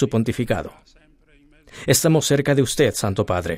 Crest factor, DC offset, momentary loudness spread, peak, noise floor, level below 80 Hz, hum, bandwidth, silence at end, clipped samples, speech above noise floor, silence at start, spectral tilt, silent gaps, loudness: 18 dB; under 0.1%; 9 LU; -4 dBFS; -54 dBFS; -46 dBFS; none; 16 kHz; 0 s; under 0.1%; 34 dB; 0 s; -4.5 dB/octave; none; -19 LUFS